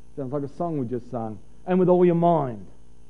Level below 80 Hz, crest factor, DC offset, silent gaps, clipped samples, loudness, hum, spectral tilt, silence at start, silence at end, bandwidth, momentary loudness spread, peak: -56 dBFS; 18 dB; 1%; none; under 0.1%; -23 LUFS; none; -10.5 dB/octave; 0.15 s; 0.45 s; 4 kHz; 16 LU; -6 dBFS